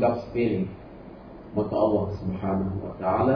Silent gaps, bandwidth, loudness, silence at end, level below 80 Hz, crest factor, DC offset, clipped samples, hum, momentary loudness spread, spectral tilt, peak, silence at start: none; 5.4 kHz; -27 LUFS; 0 s; -50 dBFS; 16 dB; under 0.1%; under 0.1%; none; 20 LU; -10.5 dB/octave; -10 dBFS; 0 s